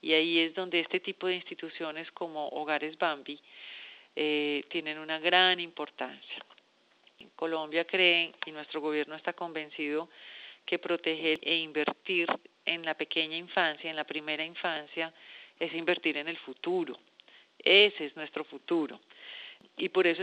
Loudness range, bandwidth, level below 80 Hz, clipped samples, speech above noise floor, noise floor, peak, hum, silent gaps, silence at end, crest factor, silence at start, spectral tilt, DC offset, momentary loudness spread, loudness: 5 LU; 8.8 kHz; under -90 dBFS; under 0.1%; 34 dB; -65 dBFS; -8 dBFS; none; none; 0 s; 24 dB; 0.05 s; -5 dB/octave; under 0.1%; 19 LU; -30 LUFS